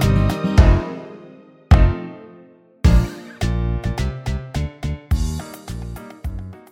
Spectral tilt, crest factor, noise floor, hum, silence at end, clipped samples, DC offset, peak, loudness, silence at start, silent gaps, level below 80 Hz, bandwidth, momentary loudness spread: -7 dB/octave; 18 dB; -47 dBFS; none; 0.15 s; under 0.1%; under 0.1%; 0 dBFS; -20 LUFS; 0 s; none; -22 dBFS; 15.5 kHz; 18 LU